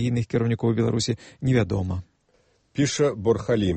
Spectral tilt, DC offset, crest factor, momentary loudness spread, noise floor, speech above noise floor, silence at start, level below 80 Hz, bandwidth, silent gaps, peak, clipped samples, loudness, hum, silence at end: -6 dB/octave; under 0.1%; 16 dB; 6 LU; -64 dBFS; 41 dB; 0 s; -48 dBFS; 8.8 kHz; none; -8 dBFS; under 0.1%; -24 LUFS; none; 0 s